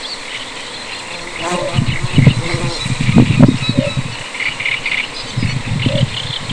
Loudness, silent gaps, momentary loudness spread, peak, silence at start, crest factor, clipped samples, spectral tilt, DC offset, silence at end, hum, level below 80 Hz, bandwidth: -16 LUFS; none; 13 LU; 0 dBFS; 0 s; 16 dB; 0.3%; -5.5 dB/octave; under 0.1%; 0 s; none; -32 dBFS; 11 kHz